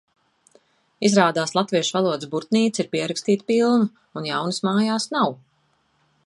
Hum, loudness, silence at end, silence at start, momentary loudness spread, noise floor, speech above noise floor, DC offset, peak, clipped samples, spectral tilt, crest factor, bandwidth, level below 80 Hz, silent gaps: none; -21 LUFS; 0.9 s; 1 s; 7 LU; -66 dBFS; 45 dB; under 0.1%; -2 dBFS; under 0.1%; -4.5 dB/octave; 20 dB; 11.5 kHz; -72 dBFS; none